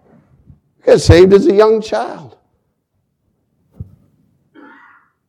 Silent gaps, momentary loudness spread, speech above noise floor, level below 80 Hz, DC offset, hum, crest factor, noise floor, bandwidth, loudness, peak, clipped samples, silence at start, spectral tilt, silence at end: none; 16 LU; 57 dB; -32 dBFS; under 0.1%; none; 14 dB; -67 dBFS; 11.5 kHz; -10 LUFS; 0 dBFS; 0.5%; 0.85 s; -6.5 dB/octave; 1.45 s